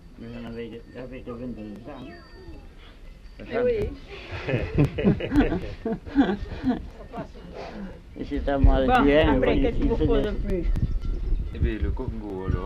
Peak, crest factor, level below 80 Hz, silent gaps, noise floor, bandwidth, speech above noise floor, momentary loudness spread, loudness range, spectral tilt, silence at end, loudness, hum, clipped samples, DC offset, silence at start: -6 dBFS; 18 dB; -30 dBFS; none; -44 dBFS; 7 kHz; 20 dB; 19 LU; 10 LU; -8.5 dB/octave; 0 s; -25 LUFS; none; under 0.1%; under 0.1%; 0 s